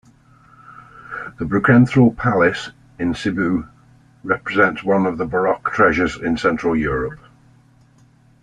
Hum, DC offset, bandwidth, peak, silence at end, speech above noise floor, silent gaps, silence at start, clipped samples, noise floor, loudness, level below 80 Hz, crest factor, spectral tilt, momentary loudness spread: none; under 0.1%; 9.8 kHz; -2 dBFS; 1.25 s; 35 dB; none; 0.7 s; under 0.1%; -52 dBFS; -18 LUFS; -44 dBFS; 18 dB; -7.5 dB/octave; 15 LU